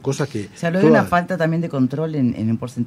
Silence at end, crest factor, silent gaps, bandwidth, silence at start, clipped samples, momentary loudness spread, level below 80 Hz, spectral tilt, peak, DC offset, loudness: 0 s; 16 dB; none; 15 kHz; 0 s; under 0.1%; 9 LU; -54 dBFS; -7 dB/octave; -2 dBFS; under 0.1%; -19 LUFS